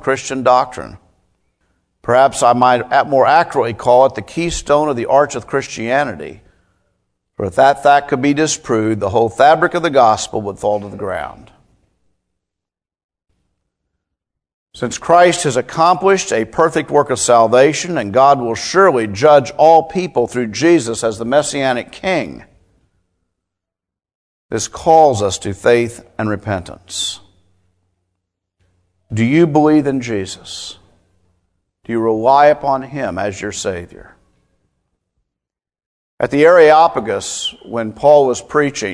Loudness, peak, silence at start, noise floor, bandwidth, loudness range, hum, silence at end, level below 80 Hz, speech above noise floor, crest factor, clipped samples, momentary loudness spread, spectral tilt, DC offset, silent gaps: -14 LUFS; 0 dBFS; 0 s; -84 dBFS; 11 kHz; 10 LU; none; 0 s; -48 dBFS; 71 dB; 16 dB; 0.1%; 13 LU; -4.5 dB/octave; under 0.1%; 13.04-13.09 s, 14.54-14.66 s, 24.15-24.49 s, 35.86-36.18 s